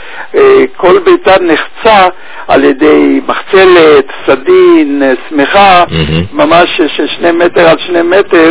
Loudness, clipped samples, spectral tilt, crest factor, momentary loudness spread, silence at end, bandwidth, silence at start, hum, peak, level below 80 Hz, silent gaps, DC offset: -6 LUFS; 10%; -9.5 dB/octave; 6 dB; 7 LU; 0 s; 4 kHz; 0 s; none; 0 dBFS; -34 dBFS; none; 6%